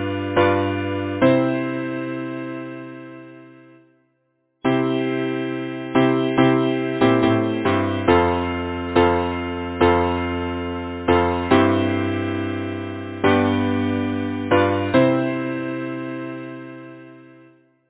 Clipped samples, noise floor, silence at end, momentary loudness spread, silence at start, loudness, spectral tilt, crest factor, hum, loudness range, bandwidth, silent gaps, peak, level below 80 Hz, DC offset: under 0.1%; -68 dBFS; 0.7 s; 13 LU; 0 s; -20 LUFS; -10.5 dB/octave; 20 dB; none; 7 LU; 4 kHz; none; -2 dBFS; -40 dBFS; under 0.1%